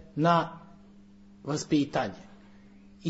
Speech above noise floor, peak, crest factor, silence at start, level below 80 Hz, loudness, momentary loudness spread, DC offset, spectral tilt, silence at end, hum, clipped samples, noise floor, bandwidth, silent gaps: 26 dB; -10 dBFS; 20 dB; 0.15 s; -62 dBFS; -28 LUFS; 21 LU; under 0.1%; -6 dB/octave; 0 s; none; under 0.1%; -53 dBFS; 8 kHz; none